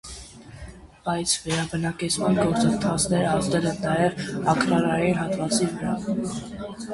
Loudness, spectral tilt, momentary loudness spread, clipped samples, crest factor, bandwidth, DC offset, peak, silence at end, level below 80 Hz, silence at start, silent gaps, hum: -24 LUFS; -4.5 dB/octave; 16 LU; under 0.1%; 18 dB; 11.5 kHz; under 0.1%; -6 dBFS; 0 s; -48 dBFS; 0.05 s; none; none